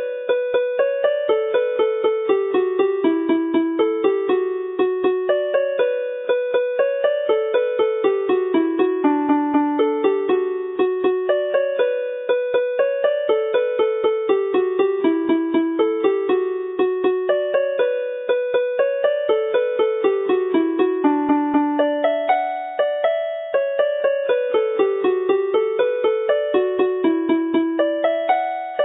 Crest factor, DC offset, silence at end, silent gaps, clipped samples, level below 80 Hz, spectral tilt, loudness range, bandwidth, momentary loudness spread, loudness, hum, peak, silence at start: 14 dB; under 0.1%; 0 s; none; under 0.1%; -70 dBFS; -9 dB/octave; 1 LU; 4 kHz; 3 LU; -20 LUFS; none; -4 dBFS; 0 s